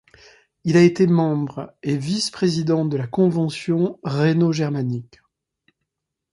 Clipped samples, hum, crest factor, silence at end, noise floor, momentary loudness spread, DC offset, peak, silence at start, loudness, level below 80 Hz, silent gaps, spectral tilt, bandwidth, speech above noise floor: under 0.1%; none; 18 dB; 1.3 s; -81 dBFS; 11 LU; under 0.1%; -2 dBFS; 0.65 s; -20 LUFS; -60 dBFS; none; -6.5 dB/octave; 11.5 kHz; 62 dB